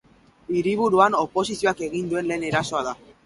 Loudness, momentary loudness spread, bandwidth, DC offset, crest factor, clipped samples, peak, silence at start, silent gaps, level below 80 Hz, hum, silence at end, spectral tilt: -23 LUFS; 10 LU; 11.5 kHz; under 0.1%; 20 dB; under 0.1%; -4 dBFS; 0.5 s; none; -56 dBFS; none; 0.3 s; -5 dB/octave